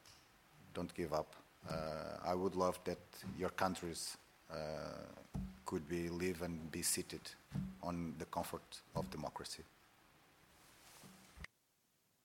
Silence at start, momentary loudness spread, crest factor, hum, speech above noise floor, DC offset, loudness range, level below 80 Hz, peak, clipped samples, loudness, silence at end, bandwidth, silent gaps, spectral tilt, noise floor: 0.05 s; 18 LU; 26 dB; none; 36 dB; under 0.1%; 7 LU; -64 dBFS; -20 dBFS; under 0.1%; -44 LUFS; 0.8 s; 17 kHz; none; -4.5 dB/octave; -79 dBFS